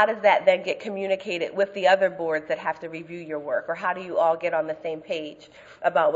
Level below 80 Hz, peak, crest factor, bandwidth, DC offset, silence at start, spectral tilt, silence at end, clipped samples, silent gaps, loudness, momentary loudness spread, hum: -72 dBFS; -4 dBFS; 20 dB; 7.8 kHz; under 0.1%; 0 s; -5 dB/octave; 0 s; under 0.1%; none; -25 LUFS; 13 LU; none